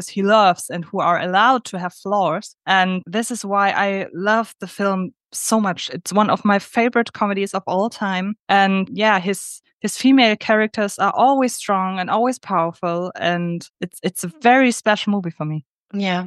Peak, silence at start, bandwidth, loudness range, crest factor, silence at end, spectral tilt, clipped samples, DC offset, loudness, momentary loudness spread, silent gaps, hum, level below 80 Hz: -2 dBFS; 0 s; 12.5 kHz; 3 LU; 18 dB; 0 s; -4.5 dB/octave; under 0.1%; under 0.1%; -19 LUFS; 12 LU; 8.39-8.47 s, 9.73-9.80 s, 13.70-13.74 s, 15.69-15.85 s; none; -72 dBFS